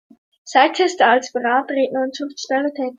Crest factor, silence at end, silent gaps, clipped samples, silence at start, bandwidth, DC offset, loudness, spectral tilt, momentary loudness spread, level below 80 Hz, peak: 18 dB; 0.05 s; none; under 0.1%; 0.45 s; 9.4 kHz; under 0.1%; -18 LUFS; -2 dB/octave; 8 LU; -72 dBFS; -2 dBFS